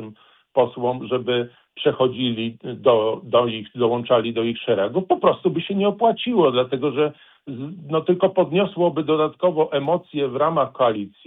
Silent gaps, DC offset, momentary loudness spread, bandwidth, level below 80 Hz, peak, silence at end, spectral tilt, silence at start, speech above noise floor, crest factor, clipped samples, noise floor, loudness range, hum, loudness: none; under 0.1%; 7 LU; 4 kHz; -64 dBFS; -4 dBFS; 0.2 s; -9.5 dB/octave; 0 s; 25 dB; 18 dB; under 0.1%; -45 dBFS; 1 LU; none; -21 LUFS